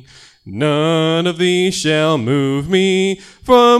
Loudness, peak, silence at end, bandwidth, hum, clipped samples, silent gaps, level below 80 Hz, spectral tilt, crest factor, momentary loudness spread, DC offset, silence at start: -15 LUFS; 0 dBFS; 0 s; 13.5 kHz; none; under 0.1%; none; -48 dBFS; -5 dB/octave; 14 dB; 6 LU; under 0.1%; 0.45 s